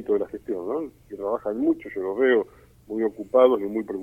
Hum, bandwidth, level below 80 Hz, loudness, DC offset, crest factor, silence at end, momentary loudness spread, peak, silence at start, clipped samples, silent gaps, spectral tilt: none; 3.6 kHz; -60 dBFS; -24 LUFS; under 0.1%; 20 dB; 0 s; 13 LU; -4 dBFS; 0 s; under 0.1%; none; -7 dB/octave